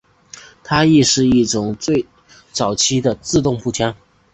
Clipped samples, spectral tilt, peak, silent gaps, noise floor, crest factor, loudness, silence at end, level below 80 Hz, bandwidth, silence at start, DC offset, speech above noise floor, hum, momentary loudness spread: under 0.1%; -4 dB/octave; -2 dBFS; none; -42 dBFS; 16 dB; -16 LUFS; 0.4 s; -44 dBFS; 8.4 kHz; 0.65 s; under 0.1%; 26 dB; none; 10 LU